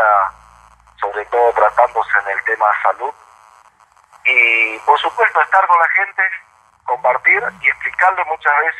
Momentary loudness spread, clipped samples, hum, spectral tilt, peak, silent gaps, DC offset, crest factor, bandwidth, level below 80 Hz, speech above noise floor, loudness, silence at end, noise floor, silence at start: 11 LU; under 0.1%; none; -2.5 dB/octave; 0 dBFS; none; under 0.1%; 16 dB; 11.5 kHz; -58 dBFS; 36 dB; -14 LUFS; 0 s; -51 dBFS; 0 s